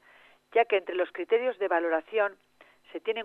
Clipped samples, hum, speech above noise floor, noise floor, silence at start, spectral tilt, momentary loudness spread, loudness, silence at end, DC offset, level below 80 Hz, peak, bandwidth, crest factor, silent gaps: under 0.1%; none; 31 dB; -59 dBFS; 0.55 s; -5 dB/octave; 7 LU; -28 LUFS; 0 s; under 0.1%; -84 dBFS; -12 dBFS; 4.2 kHz; 18 dB; none